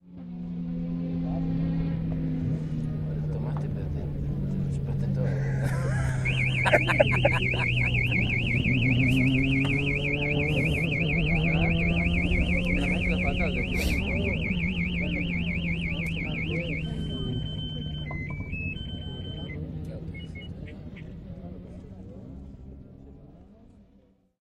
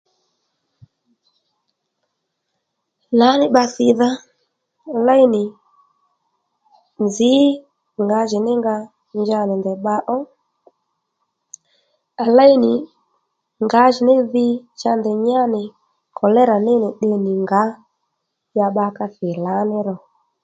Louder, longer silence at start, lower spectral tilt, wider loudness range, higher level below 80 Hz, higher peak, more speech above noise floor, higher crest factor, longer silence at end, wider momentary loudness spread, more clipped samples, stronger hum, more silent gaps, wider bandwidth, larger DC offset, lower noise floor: second, -27 LUFS vs -17 LUFS; second, 0.05 s vs 3.1 s; about the same, -7 dB/octave vs -6 dB/octave; first, 16 LU vs 6 LU; first, -36 dBFS vs -68 dBFS; second, -4 dBFS vs 0 dBFS; second, 38 dB vs 59 dB; about the same, 22 dB vs 18 dB; first, 0.6 s vs 0.45 s; first, 18 LU vs 13 LU; neither; neither; neither; first, 13.5 kHz vs 8 kHz; neither; second, -61 dBFS vs -75 dBFS